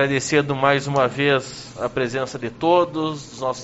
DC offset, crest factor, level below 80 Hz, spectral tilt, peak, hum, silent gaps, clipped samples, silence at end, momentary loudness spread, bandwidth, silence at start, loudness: under 0.1%; 20 dB; -54 dBFS; -4 dB/octave; -2 dBFS; none; none; under 0.1%; 0 s; 9 LU; 8 kHz; 0 s; -21 LUFS